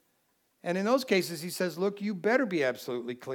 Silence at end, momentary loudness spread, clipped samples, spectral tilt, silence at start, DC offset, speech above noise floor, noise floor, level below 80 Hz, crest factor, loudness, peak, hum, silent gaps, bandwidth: 0 s; 10 LU; under 0.1%; -5 dB/octave; 0.65 s; under 0.1%; 44 dB; -73 dBFS; -88 dBFS; 20 dB; -30 LUFS; -12 dBFS; none; none; 19 kHz